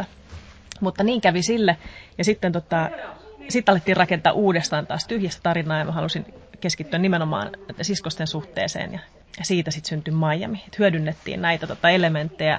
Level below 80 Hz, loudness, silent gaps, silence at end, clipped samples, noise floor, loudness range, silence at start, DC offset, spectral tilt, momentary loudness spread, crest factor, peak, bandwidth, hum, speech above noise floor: -52 dBFS; -23 LUFS; none; 0 s; under 0.1%; -42 dBFS; 4 LU; 0 s; under 0.1%; -5 dB/octave; 12 LU; 20 dB; -2 dBFS; 8 kHz; none; 20 dB